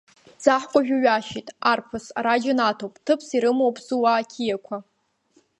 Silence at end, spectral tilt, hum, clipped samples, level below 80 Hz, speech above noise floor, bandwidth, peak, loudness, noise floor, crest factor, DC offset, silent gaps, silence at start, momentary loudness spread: 0.8 s; -4 dB/octave; none; under 0.1%; -66 dBFS; 41 dB; 11 kHz; -2 dBFS; -22 LUFS; -63 dBFS; 22 dB; under 0.1%; none; 0.4 s; 11 LU